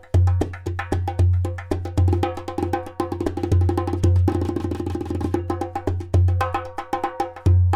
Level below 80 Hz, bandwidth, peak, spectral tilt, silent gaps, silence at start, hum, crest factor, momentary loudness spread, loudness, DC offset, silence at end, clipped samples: -34 dBFS; 10 kHz; -8 dBFS; -8 dB/octave; none; 0.05 s; none; 14 dB; 8 LU; -23 LUFS; under 0.1%; 0 s; under 0.1%